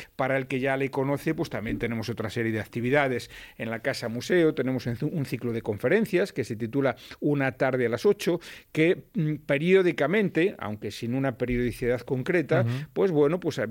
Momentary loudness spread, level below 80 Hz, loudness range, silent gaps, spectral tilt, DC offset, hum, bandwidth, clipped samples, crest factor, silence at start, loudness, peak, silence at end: 8 LU; -52 dBFS; 3 LU; none; -6.5 dB/octave; under 0.1%; none; 17 kHz; under 0.1%; 18 dB; 0 s; -27 LUFS; -8 dBFS; 0 s